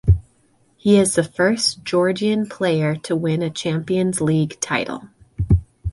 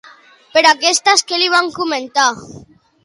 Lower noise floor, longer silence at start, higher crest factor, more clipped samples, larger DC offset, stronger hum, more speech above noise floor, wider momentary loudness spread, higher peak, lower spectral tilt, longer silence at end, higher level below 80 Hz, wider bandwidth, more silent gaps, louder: first, -59 dBFS vs -44 dBFS; second, 0.05 s vs 0.55 s; about the same, 16 dB vs 16 dB; neither; neither; neither; first, 40 dB vs 29 dB; about the same, 7 LU vs 8 LU; second, -4 dBFS vs 0 dBFS; first, -5.5 dB/octave vs -0.5 dB/octave; second, 0 s vs 0.45 s; first, -32 dBFS vs -60 dBFS; about the same, 11.5 kHz vs 11.5 kHz; neither; second, -20 LUFS vs -13 LUFS